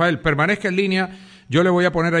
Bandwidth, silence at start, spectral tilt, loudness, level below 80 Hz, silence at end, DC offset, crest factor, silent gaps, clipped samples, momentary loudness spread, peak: 10 kHz; 0 s; -6.5 dB/octave; -19 LUFS; -46 dBFS; 0 s; under 0.1%; 16 dB; none; under 0.1%; 5 LU; -4 dBFS